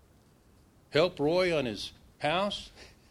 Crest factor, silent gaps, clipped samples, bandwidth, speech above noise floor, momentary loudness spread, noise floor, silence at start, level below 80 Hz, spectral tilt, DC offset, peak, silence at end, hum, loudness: 22 dB; none; under 0.1%; 14 kHz; 32 dB; 12 LU; -61 dBFS; 0.9 s; -58 dBFS; -5 dB/octave; under 0.1%; -10 dBFS; 0.25 s; none; -30 LUFS